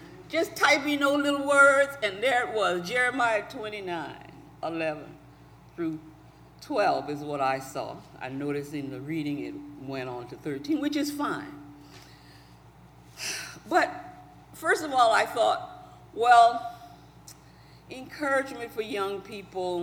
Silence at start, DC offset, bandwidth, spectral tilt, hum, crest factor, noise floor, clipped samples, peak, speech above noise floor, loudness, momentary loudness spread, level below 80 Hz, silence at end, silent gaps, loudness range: 0 s; under 0.1%; 19.5 kHz; -4 dB/octave; 60 Hz at -55 dBFS; 20 dB; -52 dBFS; under 0.1%; -8 dBFS; 26 dB; -27 LUFS; 19 LU; -62 dBFS; 0 s; none; 10 LU